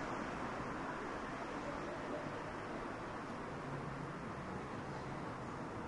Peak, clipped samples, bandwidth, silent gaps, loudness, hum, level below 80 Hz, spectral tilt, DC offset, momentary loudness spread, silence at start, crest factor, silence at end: -30 dBFS; under 0.1%; 11.5 kHz; none; -45 LUFS; none; -62 dBFS; -6 dB/octave; under 0.1%; 2 LU; 0 s; 14 dB; 0 s